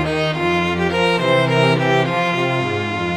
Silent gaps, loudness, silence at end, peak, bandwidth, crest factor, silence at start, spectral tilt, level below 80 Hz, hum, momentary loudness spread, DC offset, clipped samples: none; -17 LUFS; 0 s; -4 dBFS; 14 kHz; 14 dB; 0 s; -6 dB/octave; -46 dBFS; none; 4 LU; 0.1%; under 0.1%